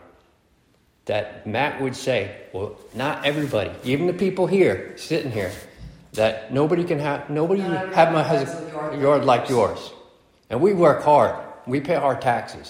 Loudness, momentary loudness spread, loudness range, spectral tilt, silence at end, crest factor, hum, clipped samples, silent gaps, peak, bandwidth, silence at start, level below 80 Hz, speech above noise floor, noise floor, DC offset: -22 LUFS; 14 LU; 5 LU; -6 dB/octave; 0 s; 20 dB; none; under 0.1%; none; -2 dBFS; 16.5 kHz; 1.05 s; -56 dBFS; 40 dB; -61 dBFS; under 0.1%